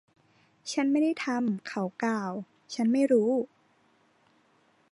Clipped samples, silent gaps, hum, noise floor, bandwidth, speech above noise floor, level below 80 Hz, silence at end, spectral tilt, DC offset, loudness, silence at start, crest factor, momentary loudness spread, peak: under 0.1%; none; none; -66 dBFS; 11 kHz; 39 dB; -82 dBFS; 1.45 s; -5.5 dB/octave; under 0.1%; -28 LUFS; 0.65 s; 16 dB; 15 LU; -14 dBFS